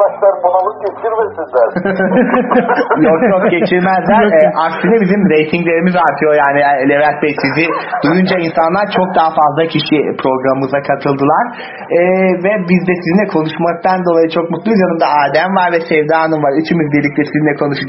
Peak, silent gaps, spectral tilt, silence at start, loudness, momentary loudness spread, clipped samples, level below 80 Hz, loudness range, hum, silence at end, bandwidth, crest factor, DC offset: 0 dBFS; none; -9.5 dB/octave; 0 s; -12 LUFS; 4 LU; under 0.1%; -50 dBFS; 2 LU; none; 0 s; 6 kHz; 12 dB; under 0.1%